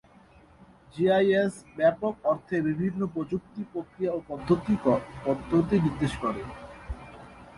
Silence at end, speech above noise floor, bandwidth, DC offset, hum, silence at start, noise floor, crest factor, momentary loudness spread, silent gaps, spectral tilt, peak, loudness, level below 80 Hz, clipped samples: 0 s; 29 dB; 11.5 kHz; under 0.1%; none; 0.6 s; -55 dBFS; 18 dB; 18 LU; none; -7.5 dB/octave; -10 dBFS; -27 LUFS; -50 dBFS; under 0.1%